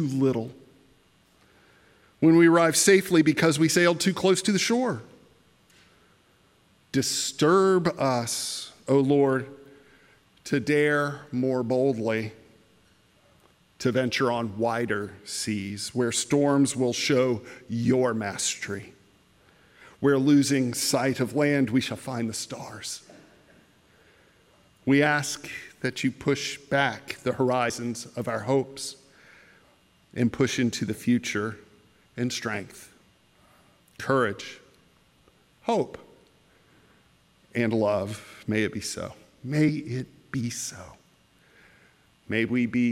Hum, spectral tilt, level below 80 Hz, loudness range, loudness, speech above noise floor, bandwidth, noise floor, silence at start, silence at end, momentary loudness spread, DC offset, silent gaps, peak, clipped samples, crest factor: none; -4.5 dB/octave; -66 dBFS; 9 LU; -25 LUFS; 37 dB; 16 kHz; -62 dBFS; 0 s; 0 s; 15 LU; under 0.1%; none; -6 dBFS; under 0.1%; 20 dB